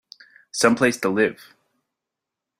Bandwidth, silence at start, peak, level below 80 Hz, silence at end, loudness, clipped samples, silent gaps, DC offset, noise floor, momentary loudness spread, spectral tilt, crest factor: 16 kHz; 0.55 s; -2 dBFS; -66 dBFS; 1.25 s; -20 LUFS; under 0.1%; none; under 0.1%; -85 dBFS; 6 LU; -4 dB/octave; 22 dB